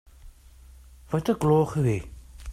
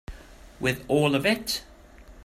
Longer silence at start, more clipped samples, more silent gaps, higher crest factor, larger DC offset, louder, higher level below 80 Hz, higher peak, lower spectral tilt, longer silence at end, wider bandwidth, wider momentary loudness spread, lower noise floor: first, 0.25 s vs 0.1 s; neither; neither; about the same, 18 dB vs 20 dB; neither; about the same, -25 LUFS vs -25 LUFS; about the same, -46 dBFS vs -48 dBFS; about the same, -10 dBFS vs -8 dBFS; first, -8 dB/octave vs -4.5 dB/octave; about the same, 0 s vs 0 s; second, 14.5 kHz vs 16 kHz; first, 19 LU vs 9 LU; about the same, -50 dBFS vs -49 dBFS